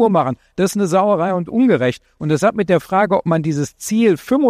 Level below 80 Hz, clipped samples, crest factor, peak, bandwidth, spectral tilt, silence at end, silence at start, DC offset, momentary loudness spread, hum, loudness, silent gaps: -54 dBFS; under 0.1%; 14 dB; -2 dBFS; 15.5 kHz; -6.5 dB/octave; 0 s; 0 s; under 0.1%; 6 LU; none; -17 LUFS; none